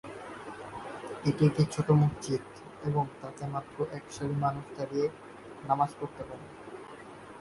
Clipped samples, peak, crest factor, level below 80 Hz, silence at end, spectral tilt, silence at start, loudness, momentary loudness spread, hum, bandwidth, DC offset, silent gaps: under 0.1%; -12 dBFS; 20 dB; -60 dBFS; 0 s; -7.5 dB/octave; 0.05 s; -31 LUFS; 20 LU; none; 11.5 kHz; under 0.1%; none